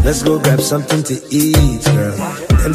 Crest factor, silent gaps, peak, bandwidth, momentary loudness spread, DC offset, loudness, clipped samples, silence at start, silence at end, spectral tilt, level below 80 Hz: 14 dB; none; 0 dBFS; 15.5 kHz; 5 LU; under 0.1%; -14 LUFS; under 0.1%; 0 s; 0 s; -5.5 dB/octave; -20 dBFS